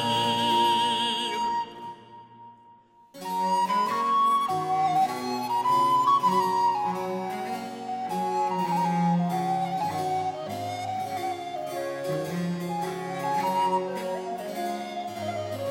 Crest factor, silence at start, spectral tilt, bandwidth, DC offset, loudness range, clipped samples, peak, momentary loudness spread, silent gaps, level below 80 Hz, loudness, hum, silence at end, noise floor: 16 dB; 0 s; -5 dB/octave; 16 kHz; under 0.1%; 6 LU; under 0.1%; -12 dBFS; 11 LU; none; -74 dBFS; -27 LUFS; none; 0 s; -55 dBFS